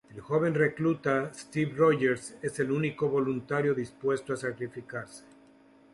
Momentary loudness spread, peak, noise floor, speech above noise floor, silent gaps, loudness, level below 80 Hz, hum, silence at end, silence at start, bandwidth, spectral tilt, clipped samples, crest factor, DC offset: 12 LU; -12 dBFS; -58 dBFS; 29 dB; none; -29 LUFS; -66 dBFS; none; 0.75 s; 0.1 s; 11.5 kHz; -6.5 dB/octave; under 0.1%; 18 dB; under 0.1%